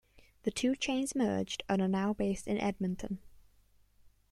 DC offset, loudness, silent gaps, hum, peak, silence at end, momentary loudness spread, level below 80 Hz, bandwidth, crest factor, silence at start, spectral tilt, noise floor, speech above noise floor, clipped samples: under 0.1%; -34 LUFS; none; 50 Hz at -55 dBFS; -18 dBFS; 0.25 s; 8 LU; -58 dBFS; 13 kHz; 16 dB; 0.45 s; -5 dB/octave; -66 dBFS; 33 dB; under 0.1%